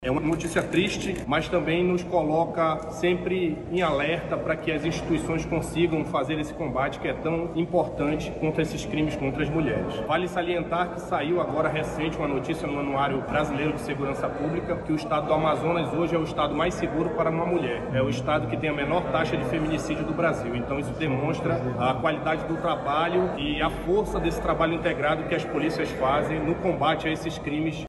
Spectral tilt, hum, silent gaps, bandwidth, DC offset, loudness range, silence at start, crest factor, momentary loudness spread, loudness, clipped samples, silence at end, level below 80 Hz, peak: -6 dB/octave; none; none; 12.5 kHz; under 0.1%; 2 LU; 0 s; 16 dB; 4 LU; -26 LUFS; under 0.1%; 0 s; -44 dBFS; -10 dBFS